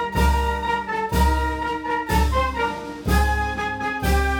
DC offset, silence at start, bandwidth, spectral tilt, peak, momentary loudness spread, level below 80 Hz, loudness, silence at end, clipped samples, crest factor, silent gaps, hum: under 0.1%; 0 s; 19 kHz; -5.5 dB/octave; -6 dBFS; 5 LU; -26 dBFS; -22 LUFS; 0 s; under 0.1%; 16 dB; none; none